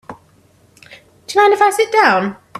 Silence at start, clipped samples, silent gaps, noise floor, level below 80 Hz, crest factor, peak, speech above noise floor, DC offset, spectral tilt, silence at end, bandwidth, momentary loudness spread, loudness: 0.1 s; under 0.1%; none; -52 dBFS; -62 dBFS; 16 dB; 0 dBFS; 39 dB; under 0.1%; -3.5 dB/octave; 0 s; 14 kHz; 6 LU; -13 LUFS